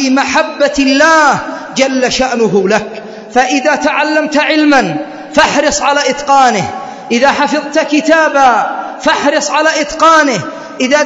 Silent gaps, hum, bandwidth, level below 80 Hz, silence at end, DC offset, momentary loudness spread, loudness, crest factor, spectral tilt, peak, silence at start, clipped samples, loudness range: none; none; 10.5 kHz; -44 dBFS; 0 s; under 0.1%; 9 LU; -10 LUFS; 10 dB; -3 dB/octave; 0 dBFS; 0 s; 0.3%; 1 LU